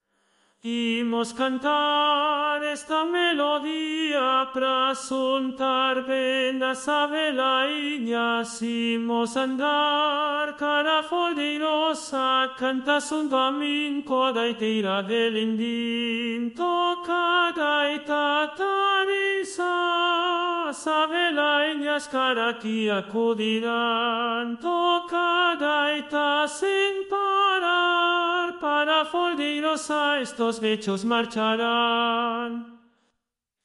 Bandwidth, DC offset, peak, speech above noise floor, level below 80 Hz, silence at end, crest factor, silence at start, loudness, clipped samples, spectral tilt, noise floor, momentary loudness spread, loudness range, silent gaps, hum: 11.5 kHz; under 0.1%; -10 dBFS; 58 dB; -72 dBFS; 0.9 s; 14 dB; 0.65 s; -24 LUFS; under 0.1%; -3 dB/octave; -82 dBFS; 5 LU; 2 LU; none; none